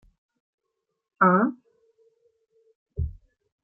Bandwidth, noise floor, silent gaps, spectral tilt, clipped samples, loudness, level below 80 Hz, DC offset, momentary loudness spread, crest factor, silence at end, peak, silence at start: 2.5 kHz; -81 dBFS; 2.75-2.86 s; -13 dB/octave; under 0.1%; -24 LUFS; -46 dBFS; under 0.1%; 16 LU; 24 dB; 0.5 s; -6 dBFS; 1.2 s